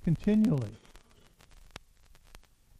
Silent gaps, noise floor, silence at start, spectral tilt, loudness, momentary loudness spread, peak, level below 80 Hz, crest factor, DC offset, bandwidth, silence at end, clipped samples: none; -60 dBFS; 0.05 s; -8.5 dB/octave; -28 LUFS; 26 LU; -16 dBFS; -52 dBFS; 18 dB; under 0.1%; 11 kHz; 0.4 s; under 0.1%